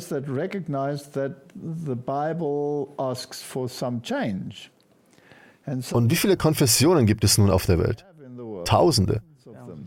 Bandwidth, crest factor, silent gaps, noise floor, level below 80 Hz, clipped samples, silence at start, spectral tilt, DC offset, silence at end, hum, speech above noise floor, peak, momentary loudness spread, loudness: 17 kHz; 18 dB; none; -58 dBFS; -46 dBFS; under 0.1%; 0 s; -5 dB/octave; under 0.1%; 0 s; none; 35 dB; -6 dBFS; 16 LU; -23 LUFS